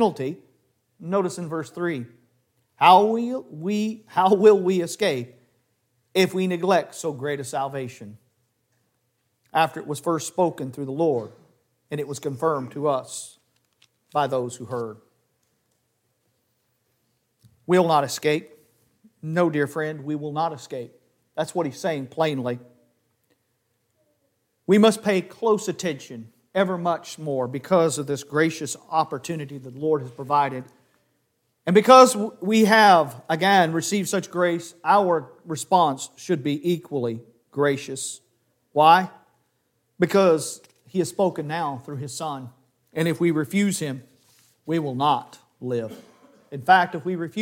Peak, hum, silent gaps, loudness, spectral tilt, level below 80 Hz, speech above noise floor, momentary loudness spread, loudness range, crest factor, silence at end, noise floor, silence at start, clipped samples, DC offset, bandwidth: 0 dBFS; none; none; -22 LUFS; -5 dB/octave; -72 dBFS; 50 dB; 18 LU; 10 LU; 24 dB; 0 s; -72 dBFS; 0 s; under 0.1%; under 0.1%; 17 kHz